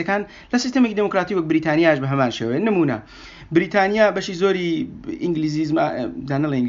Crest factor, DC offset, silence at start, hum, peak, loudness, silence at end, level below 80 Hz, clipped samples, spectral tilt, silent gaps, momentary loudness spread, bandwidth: 18 dB; under 0.1%; 0 s; none; -2 dBFS; -20 LUFS; 0 s; -52 dBFS; under 0.1%; -5 dB/octave; none; 9 LU; 7.6 kHz